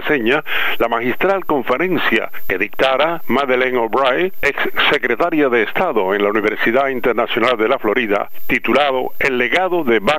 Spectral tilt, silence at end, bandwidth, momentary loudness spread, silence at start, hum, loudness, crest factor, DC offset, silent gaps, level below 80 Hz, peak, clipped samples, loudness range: -5 dB/octave; 0 s; 16 kHz; 4 LU; 0 s; none; -16 LUFS; 14 dB; 4%; none; -42 dBFS; -2 dBFS; under 0.1%; 1 LU